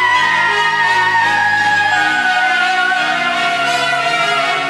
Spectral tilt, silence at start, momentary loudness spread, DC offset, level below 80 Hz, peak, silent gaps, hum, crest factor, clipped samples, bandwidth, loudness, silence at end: -1.5 dB/octave; 0 s; 3 LU; under 0.1%; -62 dBFS; -2 dBFS; none; none; 12 dB; under 0.1%; 13.5 kHz; -13 LUFS; 0 s